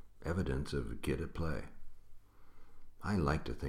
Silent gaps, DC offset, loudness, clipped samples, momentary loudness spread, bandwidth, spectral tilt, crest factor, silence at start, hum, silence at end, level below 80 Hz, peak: none; under 0.1%; -38 LUFS; under 0.1%; 10 LU; 14 kHz; -7 dB/octave; 18 dB; 0 s; none; 0 s; -46 dBFS; -20 dBFS